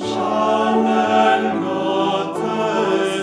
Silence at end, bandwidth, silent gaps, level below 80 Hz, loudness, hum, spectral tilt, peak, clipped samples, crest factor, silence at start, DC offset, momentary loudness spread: 0 s; 11 kHz; none; -64 dBFS; -18 LUFS; none; -5 dB/octave; -4 dBFS; under 0.1%; 14 dB; 0 s; under 0.1%; 6 LU